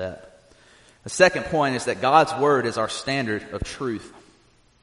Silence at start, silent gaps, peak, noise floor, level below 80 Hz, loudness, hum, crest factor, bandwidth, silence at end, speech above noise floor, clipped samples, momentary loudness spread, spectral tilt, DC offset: 0 s; none; -2 dBFS; -58 dBFS; -48 dBFS; -22 LUFS; none; 22 dB; 11.5 kHz; 0.65 s; 36 dB; under 0.1%; 15 LU; -4 dB/octave; under 0.1%